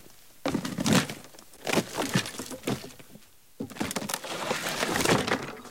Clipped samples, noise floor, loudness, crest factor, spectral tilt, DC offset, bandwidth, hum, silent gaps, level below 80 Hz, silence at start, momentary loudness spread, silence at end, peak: under 0.1%; -54 dBFS; -29 LUFS; 22 dB; -3.5 dB/octave; 0.2%; 17 kHz; none; none; -58 dBFS; 0.05 s; 16 LU; 0 s; -8 dBFS